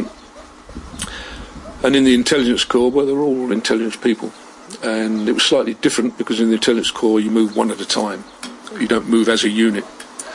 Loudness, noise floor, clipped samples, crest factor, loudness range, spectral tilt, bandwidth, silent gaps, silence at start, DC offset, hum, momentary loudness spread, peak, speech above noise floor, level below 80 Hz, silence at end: -17 LUFS; -40 dBFS; under 0.1%; 16 dB; 2 LU; -3.5 dB/octave; 11.5 kHz; none; 0 s; under 0.1%; none; 18 LU; -2 dBFS; 24 dB; -46 dBFS; 0 s